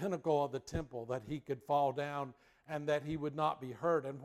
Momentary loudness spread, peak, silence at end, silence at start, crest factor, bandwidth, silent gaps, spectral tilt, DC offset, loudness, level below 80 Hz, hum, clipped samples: 8 LU; -20 dBFS; 0 s; 0 s; 16 dB; 14.5 kHz; none; -6.5 dB/octave; under 0.1%; -37 LUFS; -62 dBFS; none; under 0.1%